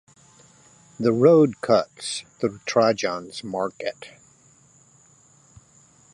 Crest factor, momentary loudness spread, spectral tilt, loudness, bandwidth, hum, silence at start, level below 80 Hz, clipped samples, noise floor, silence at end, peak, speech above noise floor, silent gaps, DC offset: 22 dB; 16 LU; -5.5 dB/octave; -22 LUFS; 11.5 kHz; none; 1 s; -66 dBFS; under 0.1%; -56 dBFS; 2.05 s; -4 dBFS; 34 dB; none; under 0.1%